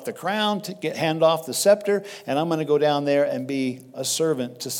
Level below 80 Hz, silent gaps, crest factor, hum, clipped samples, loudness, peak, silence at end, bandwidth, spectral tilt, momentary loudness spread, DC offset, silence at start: -78 dBFS; none; 18 dB; none; under 0.1%; -23 LUFS; -4 dBFS; 0 s; 18 kHz; -4 dB/octave; 8 LU; under 0.1%; 0 s